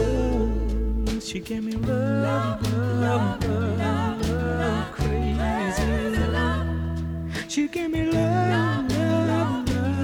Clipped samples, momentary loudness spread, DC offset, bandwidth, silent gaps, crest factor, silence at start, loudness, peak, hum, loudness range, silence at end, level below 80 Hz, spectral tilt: under 0.1%; 6 LU; under 0.1%; 17 kHz; none; 14 dB; 0 s; -25 LUFS; -10 dBFS; none; 1 LU; 0 s; -32 dBFS; -6.5 dB/octave